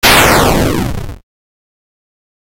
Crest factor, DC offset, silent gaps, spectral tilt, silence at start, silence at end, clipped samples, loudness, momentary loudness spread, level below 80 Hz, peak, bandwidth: 14 dB; under 0.1%; none; -3.5 dB/octave; 0.05 s; 1.15 s; 0.2%; -10 LUFS; 19 LU; -24 dBFS; 0 dBFS; over 20 kHz